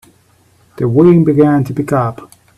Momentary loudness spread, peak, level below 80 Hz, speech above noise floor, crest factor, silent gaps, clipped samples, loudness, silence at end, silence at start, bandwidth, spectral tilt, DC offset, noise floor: 10 LU; 0 dBFS; -48 dBFS; 40 dB; 12 dB; none; under 0.1%; -12 LUFS; 0.35 s; 0.8 s; 13.5 kHz; -9.5 dB/octave; under 0.1%; -51 dBFS